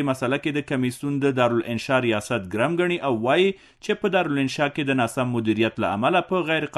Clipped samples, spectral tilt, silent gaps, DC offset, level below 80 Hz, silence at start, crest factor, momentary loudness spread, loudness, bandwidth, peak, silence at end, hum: under 0.1%; -6 dB/octave; none; under 0.1%; -60 dBFS; 0 s; 16 dB; 5 LU; -23 LUFS; 12.5 kHz; -6 dBFS; 0 s; none